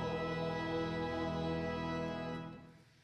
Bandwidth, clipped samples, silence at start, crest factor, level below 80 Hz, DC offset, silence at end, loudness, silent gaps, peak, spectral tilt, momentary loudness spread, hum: 10.5 kHz; under 0.1%; 0 s; 12 dB; -56 dBFS; under 0.1%; 0.2 s; -39 LUFS; none; -26 dBFS; -7 dB/octave; 7 LU; none